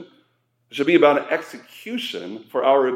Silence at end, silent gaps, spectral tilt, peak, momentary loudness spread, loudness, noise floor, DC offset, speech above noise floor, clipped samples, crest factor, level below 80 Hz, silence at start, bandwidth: 0 s; none; -5 dB/octave; -2 dBFS; 18 LU; -20 LUFS; -66 dBFS; under 0.1%; 46 dB; under 0.1%; 20 dB; -82 dBFS; 0 s; 15.5 kHz